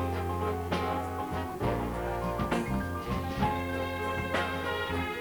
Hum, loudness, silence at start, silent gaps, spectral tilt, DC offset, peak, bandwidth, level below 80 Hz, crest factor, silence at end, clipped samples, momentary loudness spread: none; -32 LUFS; 0 s; none; -6 dB/octave; under 0.1%; -14 dBFS; over 20 kHz; -44 dBFS; 18 dB; 0 s; under 0.1%; 3 LU